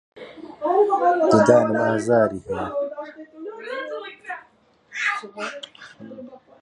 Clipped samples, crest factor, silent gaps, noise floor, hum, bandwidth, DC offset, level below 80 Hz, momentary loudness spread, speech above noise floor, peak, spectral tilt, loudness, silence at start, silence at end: under 0.1%; 20 dB; none; -57 dBFS; none; 11 kHz; under 0.1%; -60 dBFS; 23 LU; 38 dB; -2 dBFS; -6 dB/octave; -21 LUFS; 0.15 s; 0.25 s